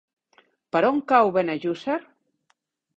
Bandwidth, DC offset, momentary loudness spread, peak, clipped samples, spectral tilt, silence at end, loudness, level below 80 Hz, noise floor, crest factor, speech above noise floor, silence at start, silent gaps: 8 kHz; under 0.1%; 10 LU; -6 dBFS; under 0.1%; -7 dB/octave; 0.95 s; -23 LUFS; -70 dBFS; -71 dBFS; 20 dB; 49 dB; 0.75 s; none